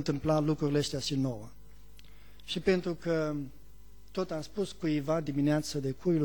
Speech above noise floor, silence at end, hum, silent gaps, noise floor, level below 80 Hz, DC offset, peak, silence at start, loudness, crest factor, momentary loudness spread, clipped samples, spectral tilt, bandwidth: 25 dB; 0 s; none; none; -55 dBFS; -54 dBFS; 0.4%; -14 dBFS; 0 s; -32 LUFS; 18 dB; 11 LU; under 0.1%; -6 dB/octave; 19 kHz